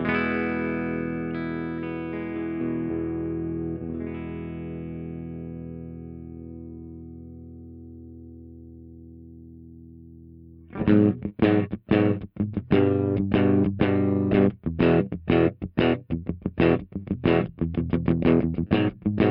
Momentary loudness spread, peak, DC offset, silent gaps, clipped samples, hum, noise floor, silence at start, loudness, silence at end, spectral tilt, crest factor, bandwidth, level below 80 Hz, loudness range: 22 LU; -6 dBFS; under 0.1%; none; under 0.1%; none; -47 dBFS; 0 s; -25 LUFS; 0 s; -11 dB/octave; 20 dB; 5.4 kHz; -48 dBFS; 20 LU